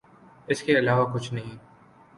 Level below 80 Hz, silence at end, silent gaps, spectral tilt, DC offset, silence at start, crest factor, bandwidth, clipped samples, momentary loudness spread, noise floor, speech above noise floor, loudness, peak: -62 dBFS; 0.6 s; none; -6 dB/octave; under 0.1%; 0.5 s; 18 dB; 11.5 kHz; under 0.1%; 14 LU; -54 dBFS; 29 dB; -25 LUFS; -8 dBFS